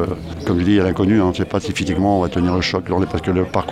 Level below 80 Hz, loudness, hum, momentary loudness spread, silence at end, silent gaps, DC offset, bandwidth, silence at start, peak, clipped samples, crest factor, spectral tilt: -38 dBFS; -18 LUFS; none; 6 LU; 0 s; none; under 0.1%; 12.5 kHz; 0 s; -2 dBFS; under 0.1%; 16 dB; -6.5 dB/octave